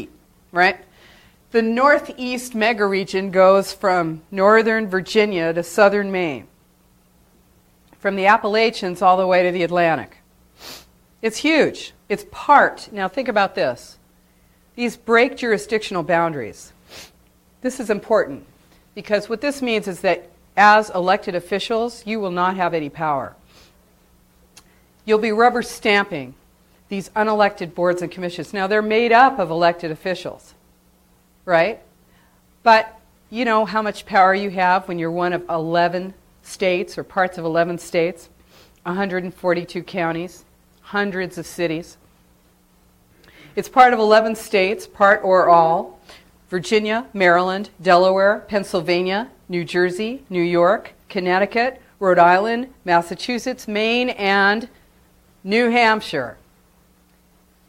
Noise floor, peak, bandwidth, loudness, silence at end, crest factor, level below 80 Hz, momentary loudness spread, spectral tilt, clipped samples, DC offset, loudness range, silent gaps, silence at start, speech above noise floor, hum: -56 dBFS; 0 dBFS; 16.5 kHz; -18 LUFS; 1.35 s; 20 dB; -56 dBFS; 14 LU; -5 dB/octave; under 0.1%; under 0.1%; 7 LU; none; 0 s; 38 dB; none